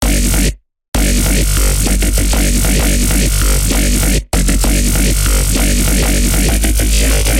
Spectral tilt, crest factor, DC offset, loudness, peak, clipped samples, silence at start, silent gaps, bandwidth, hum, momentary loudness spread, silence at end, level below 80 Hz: -3.5 dB/octave; 10 dB; under 0.1%; -13 LUFS; -2 dBFS; under 0.1%; 0 s; 0.88-0.92 s; 16.5 kHz; none; 2 LU; 0 s; -14 dBFS